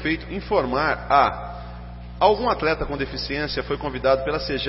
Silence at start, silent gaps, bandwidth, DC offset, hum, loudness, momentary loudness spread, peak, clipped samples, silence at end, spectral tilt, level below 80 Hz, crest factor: 0 s; none; 6 kHz; under 0.1%; 60 Hz at -35 dBFS; -22 LUFS; 16 LU; -4 dBFS; under 0.1%; 0 s; -8 dB/octave; -38 dBFS; 20 dB